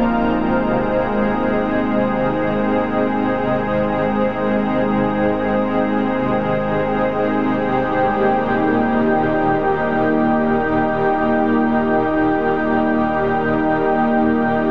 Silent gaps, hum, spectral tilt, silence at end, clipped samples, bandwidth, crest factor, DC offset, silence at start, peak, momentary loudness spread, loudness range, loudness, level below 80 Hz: none; none; -9 dB/octave; 0 s; under 0.1%; 6.2 kHz; 12 dB; 2%; 0 s; -4 dBFS; 2 LU; 1 LU; -18 LUFS; -40 dBFS